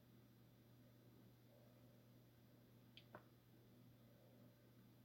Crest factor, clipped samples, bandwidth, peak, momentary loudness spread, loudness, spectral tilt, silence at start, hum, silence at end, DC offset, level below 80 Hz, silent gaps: 26 dB; under 0.1%; 16.5 kHz; -42 dBFS; 5 LU; -68 LUFS; -6 dB/octave; 0 s; none; 0 s; under 0.1%; -88 dBFS; none